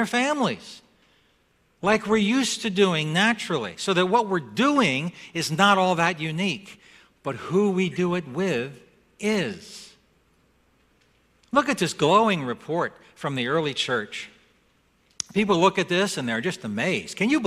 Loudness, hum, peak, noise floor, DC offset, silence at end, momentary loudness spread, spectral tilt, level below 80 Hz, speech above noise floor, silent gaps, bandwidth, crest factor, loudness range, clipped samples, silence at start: -23 LUFS; none; -4 dBFS; -65 dBFS; under 0.1%; 0 s; 13 LU; -4.5 dB/octave; -62 dBFS; 41 dB; none; 14.5 kHz; 20 dB; 6 LU; under 0.1%; 0 s